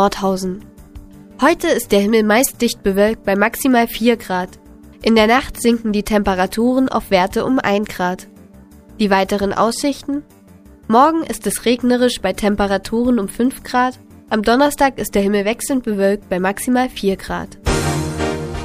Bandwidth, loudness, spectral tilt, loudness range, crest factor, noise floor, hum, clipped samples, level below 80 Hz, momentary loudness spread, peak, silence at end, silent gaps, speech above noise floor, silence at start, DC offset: 15.5 kHz; -17 LUFS; -4.5 dB/octave; 3 LU; 16 dB; -43 dBFS; none; under 0.1%; -38 dBFS; 8 LU; 0 dBFS; 0 s; none; 27 dB; 0 s; under 0.1%